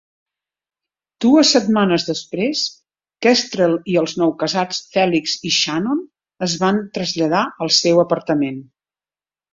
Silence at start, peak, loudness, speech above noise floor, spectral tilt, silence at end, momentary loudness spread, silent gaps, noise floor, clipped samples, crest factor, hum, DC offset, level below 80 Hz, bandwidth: 1.2 s; 0 dBFS; -17 LUFS; over 73 dB; -4 dB/octave; 0.9 s; 9 LU; none; under -90 dBFS; under 0.1%; 18 dB; none; under 0.1%; -60 dBFS; 7.8 kHz